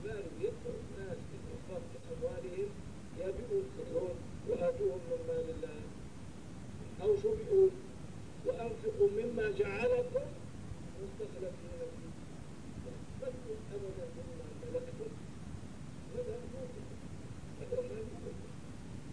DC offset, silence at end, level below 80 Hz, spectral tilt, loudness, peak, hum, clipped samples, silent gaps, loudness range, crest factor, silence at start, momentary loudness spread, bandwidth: 0.3%; 0 s; -56 dBFS; -7 dB/octave; -39 LUFS; -18 dBFS; none; under 0.1%; none; 11 LU; 20 dB; 0 s; 16 LU; 10.5 kHz